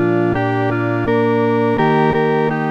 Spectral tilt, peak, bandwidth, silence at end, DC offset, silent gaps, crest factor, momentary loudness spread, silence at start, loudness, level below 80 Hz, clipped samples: -9 dB/octave; -4 dBFS; 7.8 kHz; 0 s; under 0.1%; none; 12 dB; 3 LU; 0 s; -16 LUFS; -44 dBFS; under 0.1%